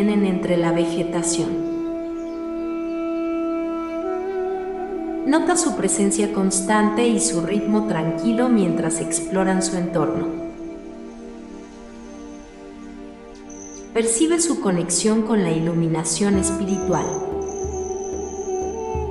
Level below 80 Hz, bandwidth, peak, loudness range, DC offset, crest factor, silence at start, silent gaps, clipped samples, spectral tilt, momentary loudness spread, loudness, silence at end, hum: -46 dBFS; 12 kHz; -6 dBFS; 8 LU; under 0.1%; 16 dB; 0 s; none; under 0.1%; -4.5 dB/octave; 19 LU; -21 LUFS; 0 s; none